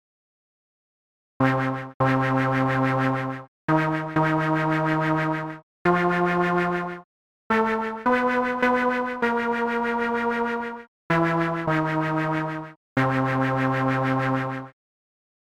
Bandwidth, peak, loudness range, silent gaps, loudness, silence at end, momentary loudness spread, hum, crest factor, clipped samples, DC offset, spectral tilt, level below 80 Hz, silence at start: 11.5 kHz; -6 dBFS; 2 LU; 1.94-2.00 s, 3.48-3.68 s, 5.63-5.85 s, 7.04-7.50 s, 10.88-11.10 s, 12.76-12.96 s; -24 LUFS; 0.75 s; 8 LU; none; 18 dB; under 0.1%; under 0.1%; -7.5 dB/octave; -56 dBFS; 1.4 s